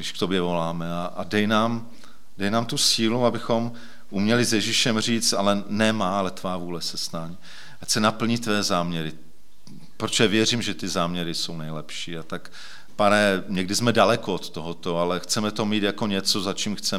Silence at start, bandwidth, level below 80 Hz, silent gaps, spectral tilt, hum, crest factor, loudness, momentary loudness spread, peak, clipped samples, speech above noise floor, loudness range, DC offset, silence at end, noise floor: 0 s; 16.5 kHz; -60 dBFS; none; -3.5 dB/octave; none; 22 dB; -23 LUFS; 13 LU; -4 dBFS; under 0.1%; 26 dB; 3 LU; 2%; 0 s; -50 dBFS